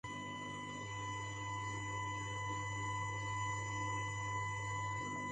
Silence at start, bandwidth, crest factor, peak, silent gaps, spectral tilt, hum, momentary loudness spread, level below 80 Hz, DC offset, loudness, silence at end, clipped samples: 0.05 s; 9.4 kHz; 12 dB; -28 dBFS; none; -4 dB/octave; none; 5 LU; -60 dBFS; under 0.1%; -41 LUFS; 0 s; under 0.1%